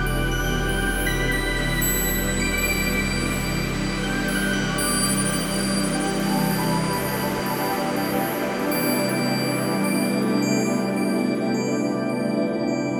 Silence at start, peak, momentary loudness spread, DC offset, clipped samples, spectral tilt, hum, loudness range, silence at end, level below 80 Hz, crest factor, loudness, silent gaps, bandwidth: 0 s; -8 dBFS; 3 LU; under 0.1%; under 0.1%; -4 dB/octave; none; 1 LU; 0 s; -34 dBFS; 14 dB; -23 LUFS; none; over 20 kHz